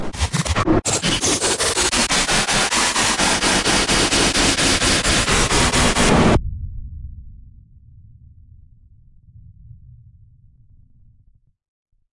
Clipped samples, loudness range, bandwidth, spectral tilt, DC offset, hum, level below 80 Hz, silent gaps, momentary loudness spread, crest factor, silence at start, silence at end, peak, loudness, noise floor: under 0.1%; 6 LU; 11.5 kHz; -2.5 dB/octave; under 0.1%; none; -30 dBFS; none; 8 LU; 16 dB; 0 s; 2.45 s; -4 dBFS; -16 LUFS; -55 dBFS